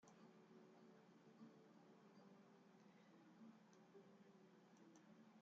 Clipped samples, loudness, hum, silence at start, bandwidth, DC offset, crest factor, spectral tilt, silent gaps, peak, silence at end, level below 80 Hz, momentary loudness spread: under 0.1%; -69 LUFS; none; 0 s; 7.2 kHz; under 0.1%; 16 dB; -5.5 dB/octave; none; -54 dBFS; 0 s; under -90 dBFS; 3 LU